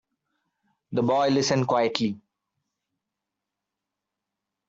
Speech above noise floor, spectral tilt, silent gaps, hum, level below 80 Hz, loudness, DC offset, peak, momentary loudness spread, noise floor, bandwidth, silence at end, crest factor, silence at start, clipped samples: 62 dB; -5 dB/octave; none; none; -68 dBFS; -24 LUFS; under 0.1%; -4 dBFS; 9 LU; -85 dBFS; 8 kHz; 2.5 s; 24 dB; 0.9 s; under 0.1%